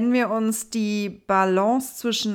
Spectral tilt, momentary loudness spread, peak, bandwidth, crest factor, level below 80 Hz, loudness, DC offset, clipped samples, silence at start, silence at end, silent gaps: -4 dB/octave; 6 LU; -8 dBFS; 19 kHz; 14 dB; -66 dBFS; -23 LUFS; under 0.1%; under 0.1%; 0 s; 0 s; none